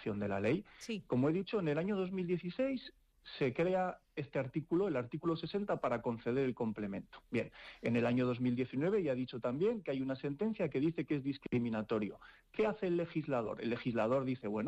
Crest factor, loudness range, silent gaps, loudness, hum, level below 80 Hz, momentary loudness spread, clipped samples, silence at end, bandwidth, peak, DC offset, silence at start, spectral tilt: 12 dB; 2 LU; none; -37 LUFS; none; -68 dBFS; 7 LU; under 0.1%; 0 s; 10 kHz; -26 dBFS; under 0.1%; 0 s; -8 dB/octave